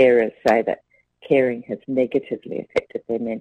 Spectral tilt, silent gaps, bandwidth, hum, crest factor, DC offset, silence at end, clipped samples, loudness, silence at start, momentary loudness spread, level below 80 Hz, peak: -7 dB/octave; none; 9 kHz; none; 16 dB; under 0.1%; 0 s; under 0.1%; -22 LUFS; 0 s; 11 LU; -60 dBFS; -4 dBFS